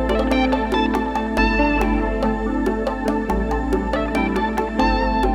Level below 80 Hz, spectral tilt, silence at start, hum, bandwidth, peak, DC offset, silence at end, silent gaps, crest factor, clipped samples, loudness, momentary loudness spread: -26 dBFS; -6.5 dB/octave; 0 s; none; 14 kHz; -4 dBFS; under 0.1%; 0 s; none; 16 dB; under 0.1%; -20 LUFS; 4 LU